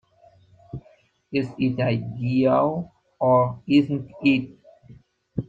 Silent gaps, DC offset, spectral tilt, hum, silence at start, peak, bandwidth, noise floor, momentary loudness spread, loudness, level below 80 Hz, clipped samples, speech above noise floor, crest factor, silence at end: none; under 0.1%; -9 dB/octave; none; 0.75 s; -6 dBFS; 7.4 kHz; -58 dBFS; 21 LU; -22 LUFS; -56 dBFS; under 0.1%; 37 dB; 18 dB; 0.05 s